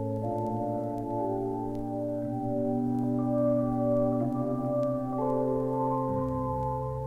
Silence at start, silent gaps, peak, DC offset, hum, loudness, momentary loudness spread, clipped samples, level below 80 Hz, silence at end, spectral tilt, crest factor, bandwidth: 0 s; none; -16 dBFS; under 0.1%; none; -30 LUFS; 6 LU; under 0.1%; -50 dBFS; 0 s; -11 dB/octave; 12 dB; 11 kHz